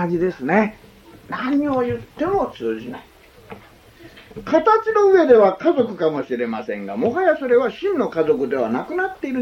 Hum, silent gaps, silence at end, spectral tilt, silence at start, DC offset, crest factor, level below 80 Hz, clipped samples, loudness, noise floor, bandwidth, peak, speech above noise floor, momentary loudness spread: none; none; 0 s; -7 dB/octave; 0 s; under 0.1%; 18 dB; -52 dBFS; under 0.1%; -19 LUFS; -46 dBFS; 7 kHz; -2 dBFS; 27 dB; 13 LU